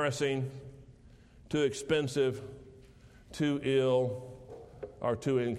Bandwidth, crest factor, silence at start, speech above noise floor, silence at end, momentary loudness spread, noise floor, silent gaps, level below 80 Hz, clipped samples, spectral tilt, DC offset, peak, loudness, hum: 13 kHz; 16 dB; 0 s; 26 dB; 0 s; 20 LU; -57 dBFS; none; -60 dBFS; under 0.1%; -5.5 dB/octave; under 0.1%; -16 dBFS; -32 LUFS; none